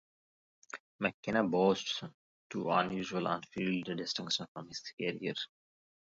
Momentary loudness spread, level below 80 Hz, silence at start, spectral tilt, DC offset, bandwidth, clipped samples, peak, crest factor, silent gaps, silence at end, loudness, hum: 14 LU; -74 dBFS; 0.75 s; -3.5 dB/octave; under 0.1%; 7.6 kHz; under 0.1%; -16 dBFS; 20 dB; 0.80-0.99 s, 1.14-1.23 s, 2.14-2.50 s, 4.48-4.55 s, 4.93-4.98 s; 0.7 s; -35 LUFS; none